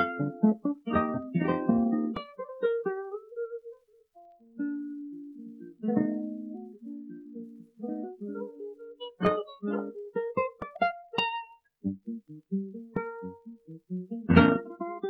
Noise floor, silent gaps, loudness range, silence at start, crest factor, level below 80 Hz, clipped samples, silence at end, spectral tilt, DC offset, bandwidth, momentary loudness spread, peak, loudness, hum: -58 dBFS; none; 7 LU; 0 s; 28 dB; -56 dBFS; under 0.1%; 0 s; -9 dB/octave; under 0.1%; 5.8 kHz; 17 LU; -4 dBFS; -31 LUFS; none